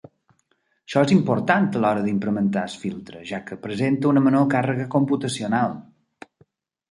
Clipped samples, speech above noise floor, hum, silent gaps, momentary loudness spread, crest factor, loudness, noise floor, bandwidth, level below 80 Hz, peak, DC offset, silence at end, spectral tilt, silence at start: under 0.1%; 47 dB; none; none; 14 LU; 20 dB; -22 LUFS; -68 dBFS; 11.5 kHz; -62 dBFS; -2 dBFS; under 0.1%; 1.1 s; -6.5 dB/octave; 0.9 s